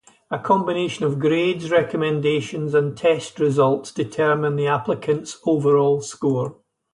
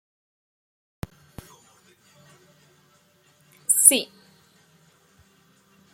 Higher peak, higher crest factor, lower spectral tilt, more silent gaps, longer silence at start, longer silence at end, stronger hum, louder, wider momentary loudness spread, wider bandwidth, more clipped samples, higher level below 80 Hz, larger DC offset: second, -6 dBFS vs 0 dBFS; second, 16 dB vs 30 dB; first, -6 dB/octave vs -0.5 dB/octave; neither; second, 0.3 s vs 3.7 s; second, 0.4 s vs 1.9 s; neither; second, -21 LUFS vs -17 LUFS; second, 6 LU vs 27 LU; second, 11 kHz vs 16.5 kHz; neither; about the same, -62 dBFS vs -60 dBFS; neither